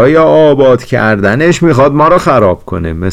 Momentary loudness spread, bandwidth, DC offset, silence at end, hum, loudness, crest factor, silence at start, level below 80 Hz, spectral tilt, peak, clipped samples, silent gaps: 7 LU; 13 kHz; under 0.1%; 0 s; none; -8 LUFS; 8 dB; 0 s; -32 dBFS; -7 dB/octave; 0 dBFS; under 0.1%; none